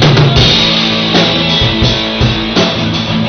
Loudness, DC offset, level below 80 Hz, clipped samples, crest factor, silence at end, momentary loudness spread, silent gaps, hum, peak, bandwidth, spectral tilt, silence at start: -9 LUFS; under 0.1%; -24 dBFS; under 0.1%; 10 dB; 0 s; 5 LU; none; none; 0 dBFS; 6.6 kHz; -5 dB/octave; 0 s